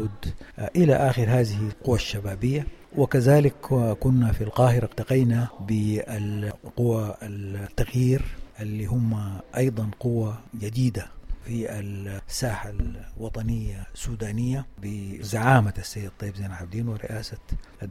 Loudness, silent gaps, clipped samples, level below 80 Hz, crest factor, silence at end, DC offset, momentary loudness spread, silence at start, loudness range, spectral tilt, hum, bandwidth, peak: -26 LUFS; none; under 0.1%; -38 dBFS; 18 dB; 0 s; under 0.1%; 15 LU; 0 s; 9 LU; -7 dB/octave; none; 15 kHz; -6 dBFS